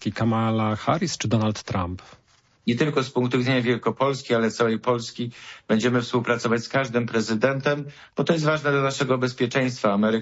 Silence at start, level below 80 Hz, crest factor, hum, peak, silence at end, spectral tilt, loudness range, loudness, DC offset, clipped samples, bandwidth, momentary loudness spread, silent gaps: 0 s; -58 dBFS; 18 dB; none; -6 dBFS; 0 s; -5.5 dB/octave; 1 LU; -24 LUFS; under 0.1%; under 0.1%; 8 kHz; 7 LU; none